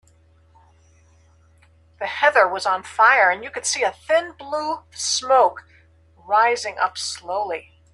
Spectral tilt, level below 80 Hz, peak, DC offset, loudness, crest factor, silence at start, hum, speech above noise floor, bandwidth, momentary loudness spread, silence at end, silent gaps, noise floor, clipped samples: -0.5 dB/octave; -62 dBFS; -2 dBFS; under 0.1%; -20 LUFS; 20 dB; 2 s; none; 35 dB; 12.5 kHz; 12 LU; 0.3 s; none; -55 dBFS; under 0.1%